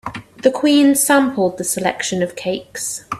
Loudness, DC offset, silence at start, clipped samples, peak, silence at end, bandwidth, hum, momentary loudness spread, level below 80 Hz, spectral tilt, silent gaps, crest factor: -17 LUFS; under 0.1%; 0.05 s; under 0.1%; 0 dBFS; 0 s; 15.5 kHz; none; 12 LU; -56 dBFS; -3.5 dB/octave; none; 16 dB